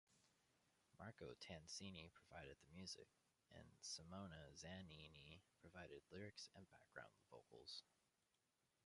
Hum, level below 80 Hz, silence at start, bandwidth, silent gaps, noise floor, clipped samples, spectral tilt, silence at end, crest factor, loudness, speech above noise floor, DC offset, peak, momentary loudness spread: none; -78 dBFS; 0.1 s; 11.5 kHz; none; -89 dBFS; under 0.1%; -3.5 dB/octave; 0.9 s; 20 dB; -60 LUFS; 28 dB; under 0.1%; -42 dBFS; 11 LU